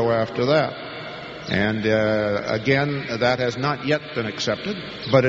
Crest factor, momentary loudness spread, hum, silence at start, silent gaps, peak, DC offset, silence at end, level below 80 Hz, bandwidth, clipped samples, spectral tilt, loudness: 18 dB; 11 LU; none; 0 s; none; -2 dBFS; under 0.1%; 0 s; -52 dBFS; 7.8 kHz; under 0.1%; -4 dB/octave; -22 LUFS